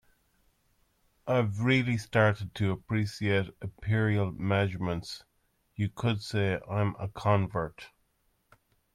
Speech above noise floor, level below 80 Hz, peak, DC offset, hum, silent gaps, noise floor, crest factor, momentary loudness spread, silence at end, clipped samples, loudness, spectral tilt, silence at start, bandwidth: 44 dB; -58 dBFS; -12 dBFS; under 0.1%; none; none; -73 dBFS; 20 dB; 13 LU; 1.05 s; under 0.1%; -30 LUFS; -7 dB/octave; 1.25 s; 12 kHz